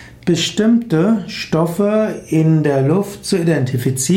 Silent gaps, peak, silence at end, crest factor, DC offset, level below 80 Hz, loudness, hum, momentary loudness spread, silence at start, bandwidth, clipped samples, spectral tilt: none; -4 dBFS; 0 s; 12 dB; under 0.1%; -50 dBFS; -16 LUFS; none; 5 LU; 0 s; 16.5 kHz; under 0.1%; -6 dB/octave